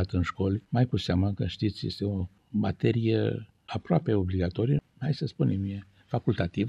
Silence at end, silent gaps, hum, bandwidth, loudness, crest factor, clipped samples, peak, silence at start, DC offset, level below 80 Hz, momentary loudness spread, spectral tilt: 0 s; none; none; 8.2 kHz; -29 LUFS; 18 dB; under 0.1%; -10 dBFS; 0 s; under 0.1%; -54 dBFS; 8 LU; -8.5 dB/octave